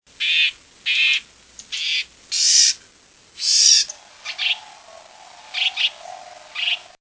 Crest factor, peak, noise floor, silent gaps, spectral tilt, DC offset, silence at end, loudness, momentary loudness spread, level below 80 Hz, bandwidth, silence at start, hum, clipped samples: 20 dB; -2 dBFS; -52 dBFS; none; 5 dB/octave; under 0.1%; 0.2 s; -17 LUFS; 18 LU; -68 dBFS; 8 kHz; 0.2 s; none; under 0.1%